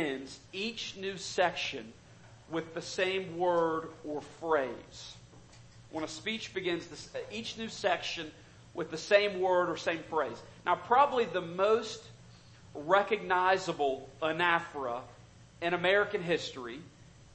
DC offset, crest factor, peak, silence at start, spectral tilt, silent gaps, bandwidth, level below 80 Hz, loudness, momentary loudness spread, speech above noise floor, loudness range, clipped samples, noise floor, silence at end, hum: under 0.1%; 24 dB; -10 dBFS; 0 s; -4 dB/octave; none; 8.8 kHz; -66 dBFS; -32 LUFS; 16 LU; 23 dB; 7 LU; under 0.1%; -55 dBFS; 0 s; none